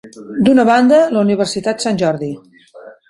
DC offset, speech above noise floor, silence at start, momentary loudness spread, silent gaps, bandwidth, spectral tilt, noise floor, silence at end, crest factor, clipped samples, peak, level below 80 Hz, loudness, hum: under 0.1%; 26 dB; 0.05 s; 15 LU; none; 11.5 kHz; -5.5 dB/octave; -39 dBFS; 0.2 s; 14 dB; under 0.1%; -2 dBFS; -54 dBFS; -13 LUFS; none